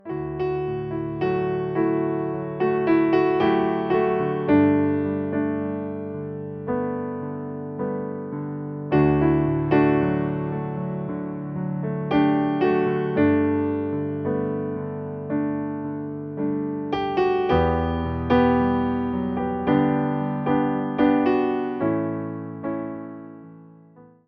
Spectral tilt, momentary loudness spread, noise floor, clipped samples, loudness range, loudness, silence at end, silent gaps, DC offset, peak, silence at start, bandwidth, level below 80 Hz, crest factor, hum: -10 dB/octave; 11 LU; -50 dBFS; under 0.1%; 6 LU; -23 LUFS; 0.25 s; none; under 0.1%; -6 dBFS; 0.05 s; 5.4 kHz; -46 dBFS; 16 dB; none